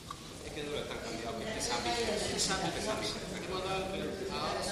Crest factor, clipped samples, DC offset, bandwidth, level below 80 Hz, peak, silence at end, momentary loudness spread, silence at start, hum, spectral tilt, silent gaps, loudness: 16 dB; under 0.1%; under 0.1%; 15.5 kHz; -54 dBFS; -20 dBFS; 0 s; 8 LU; 0 s; none; -3 dB/octave; none; -35 LUFS